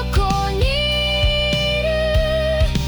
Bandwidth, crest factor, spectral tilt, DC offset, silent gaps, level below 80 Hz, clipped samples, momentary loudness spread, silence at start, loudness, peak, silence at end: over 20 kHz; 12 dB; -5 dB/octave; under 0.1%; none; -22 dBFS; under 0.1%; 2 LU; 0 s; -18 LUFS; -6 dBFS; 0 s